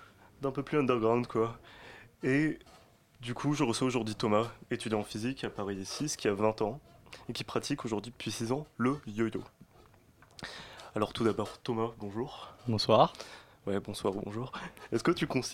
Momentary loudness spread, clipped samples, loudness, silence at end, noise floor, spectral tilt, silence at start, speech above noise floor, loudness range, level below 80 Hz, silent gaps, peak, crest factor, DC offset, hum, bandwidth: 15 LU; under 0.1%; -33 LUFS; 0 s; -61 dBFS; -5.5 dB/octave; 0 s; 28 dB; 4 LU; -62 dBFS; none; -10 dBFS; 24 dB; under 0.1%; none; 16.5 kHz